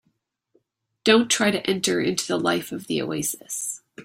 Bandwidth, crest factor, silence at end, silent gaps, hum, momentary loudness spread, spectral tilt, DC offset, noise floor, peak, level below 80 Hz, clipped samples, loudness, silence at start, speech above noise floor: 16 kHz; 22 dB; 0 s; none; none; 10 LU; -3 dB/octave; under 0.1%; -72 dBFS; -4 dBFS; -64 dBFS; under 0.1%; -23 LUFS; 1.05 s; 49 dB